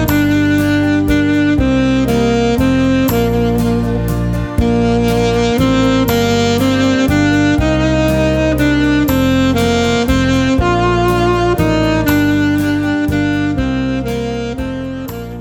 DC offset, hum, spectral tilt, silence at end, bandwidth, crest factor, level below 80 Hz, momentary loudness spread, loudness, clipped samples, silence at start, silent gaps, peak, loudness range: under 0.1%; none; -6 dB/octave; 0 s; 19.5 kHz; 12 dB; -26 dBFS; 5 LU; -13 LUFS; under 0.1%; 0 s; none; -2 dBFS; 2 LU